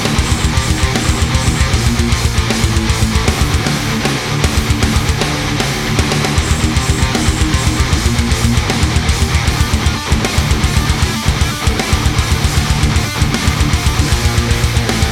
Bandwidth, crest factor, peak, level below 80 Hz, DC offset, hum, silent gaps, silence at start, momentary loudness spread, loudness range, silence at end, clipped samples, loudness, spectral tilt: 16.5 kHz; 14 dB; 0 dBFS; -18 dBFS; under 0.1%; none; none; 0 s; 1 LU; 1 LU; 0 s; under 0.1%; -14 LUFS; -4.5 dB/octave